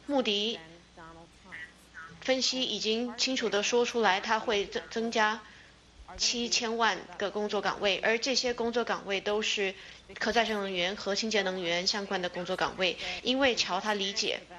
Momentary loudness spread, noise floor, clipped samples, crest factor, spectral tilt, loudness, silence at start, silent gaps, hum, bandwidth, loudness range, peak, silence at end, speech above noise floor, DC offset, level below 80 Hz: 8 LU; -54 dBFS; under 0.1%; 20 dB; -2 dB/octave; -29 LUFS; 0.1 s; none; none; 12 kHz; 2 LU; -12 dBFS; 0 s; 24 dB; under 0.1%; -62 dBFS